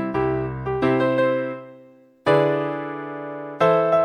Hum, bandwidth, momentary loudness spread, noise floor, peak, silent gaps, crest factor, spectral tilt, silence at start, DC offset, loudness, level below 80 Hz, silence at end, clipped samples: none; 9.6 kHz; 13 LU; -50 dBFS; -4 dBFS; none; 18 dB; -8 dB/octave; 0 s; under 0.1%; -22 LUFS; -48 dBFS; 0 s; under 0.1%